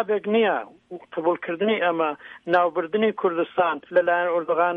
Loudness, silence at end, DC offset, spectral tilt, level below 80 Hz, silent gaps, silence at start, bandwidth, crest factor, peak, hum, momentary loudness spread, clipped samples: -23 LUFS; 0 s; under 0.1%; -7.5 dB/octave; -72 dBFS; none; 0 s; 4.9 kHz; 16 dB; -6 dBFS; none; 8 LU; under 0.1%